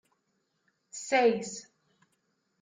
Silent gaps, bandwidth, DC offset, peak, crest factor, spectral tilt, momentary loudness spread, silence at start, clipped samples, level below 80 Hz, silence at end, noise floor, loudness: none; 9.6 kHz; under 0.1%; -14 dBFS; 20 dB; -3 dB/octave; 19 LU; 0.95 s; under 0.1%; -80 dBFS; 1 s; -77 dBFS; -27 LUFS